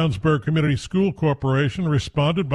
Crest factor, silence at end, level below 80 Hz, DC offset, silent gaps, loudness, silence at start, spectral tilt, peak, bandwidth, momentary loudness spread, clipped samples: 14 dB; 0 s; -44 dBFS; under 0.1%; none; -21 LUFS; 0 s; -7 dB/octave; -6 dBFS; 10.5 kHz; 2 LU; under 0.1%